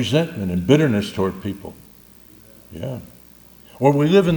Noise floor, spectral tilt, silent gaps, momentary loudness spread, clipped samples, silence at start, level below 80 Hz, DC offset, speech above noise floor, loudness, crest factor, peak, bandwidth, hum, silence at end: -47 dBFS; -7 dB/octave; none; 19 LU; under 0.1%; 0 s; -52 dBFS; under 0.1%; 28 dB; -19 LUFS; 20 dB; 0 dBFS; 19.5 kHz; none; 0 s